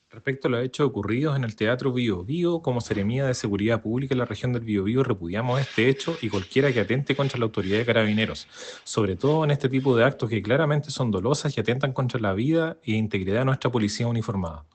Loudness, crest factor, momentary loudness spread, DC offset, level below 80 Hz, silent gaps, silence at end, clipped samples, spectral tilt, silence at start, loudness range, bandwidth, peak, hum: -25 LUFS; 18 dB; 5 LU; under 0.1%; -58 dBFS; none; 0.1 s; under 0.1%; -6.5 dB/octave; 0.15 s; 2 LU; 9 kHz; -6 dBFS; none